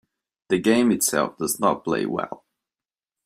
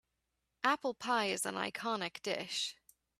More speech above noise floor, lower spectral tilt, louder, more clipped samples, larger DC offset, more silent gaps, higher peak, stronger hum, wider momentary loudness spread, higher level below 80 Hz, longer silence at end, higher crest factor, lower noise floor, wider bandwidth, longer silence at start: first, over 68 dB vs 49 dB; first, -4 dB/octave vs -2 dB/octave; first, -22 LUFS vs -36 LUFS; neither; neither; neither; first, -6 dBFS vs -14 dBFS; neither; first, 11 LU vs 5 LU; first, -62 dBFS vs -80 dBFS; first, 0.9 s vs 0.45 s; about the same, 20 dB vs 24 dB; first, under -90 dBFS vs -85 dBFS; first, 16 kHz vs 14.5 kHz; second, 0.5 s vs 0.65 s